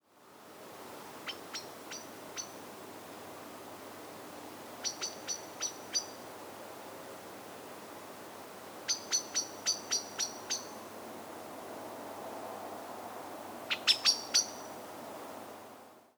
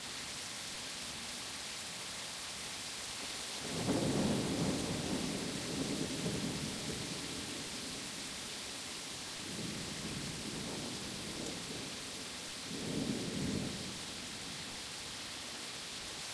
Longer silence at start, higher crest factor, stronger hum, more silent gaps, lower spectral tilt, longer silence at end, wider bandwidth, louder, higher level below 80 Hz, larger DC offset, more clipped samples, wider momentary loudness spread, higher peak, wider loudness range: about the same, 0.1 s vs 0 s; first, 28 dB vs 16 dB; neither; neither; second, 0 dB/octave vs -3 dB/octave; about the same, 0.1 s vs 0 s; first, over 20 kHz vs 11 kHz; first, -36 LUFS vs -39 LUFS; second, -84 dBFS vs -60 dBFS; neither; neither; first, 16 LU vs 7 LU; first, -12 dBFS vs -24 dBFS; first, 12 LU vs 4 LU